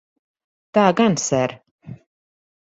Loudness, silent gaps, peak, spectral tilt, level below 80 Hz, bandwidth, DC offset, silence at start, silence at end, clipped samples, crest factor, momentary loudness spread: -19 LUFS; 1.71-1.79 s; 0 dBFS; -5 dB/octave; -60 dBFS; 8.2 kHz; under 0.1%; 0.75 s; 0.65 s; under 0.1%; 22 dB; 7 LU